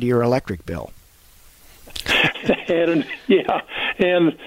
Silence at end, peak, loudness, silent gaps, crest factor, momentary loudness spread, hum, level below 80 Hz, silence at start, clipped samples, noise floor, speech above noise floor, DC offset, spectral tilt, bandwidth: 0 s; -4 dBFS; -20 LUFS; none; 16 dB; 14 LU; none; -46 dBFS; 0 s; under 0.1%; -49 dBFS; 30 dB; under 0.1%; -5.5 dB/octave; 16 kHz